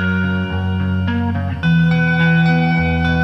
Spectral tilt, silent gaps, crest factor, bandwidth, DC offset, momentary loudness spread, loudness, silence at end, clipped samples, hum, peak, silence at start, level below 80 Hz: -8.5 dB/octave; none; 12 dB; 6 kHz; under 0.1%; 6 LU; -16 LUFS; 0 s; under 0.1%; none; -4 dBFS; 0 s; -34 dBFS